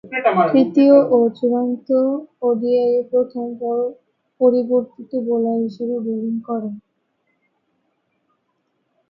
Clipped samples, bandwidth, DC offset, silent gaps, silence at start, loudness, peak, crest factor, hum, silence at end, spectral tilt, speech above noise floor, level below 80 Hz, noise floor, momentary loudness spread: under 0.1%; 5.6 kHz; under 0.1%; none; 0.05 s; -18 LUFS; -2 dBFS; 18 dB; none; 2.3 s; -9 dB/octave; 52 dB; -70 dBFS; -70 dBFS; 13 LU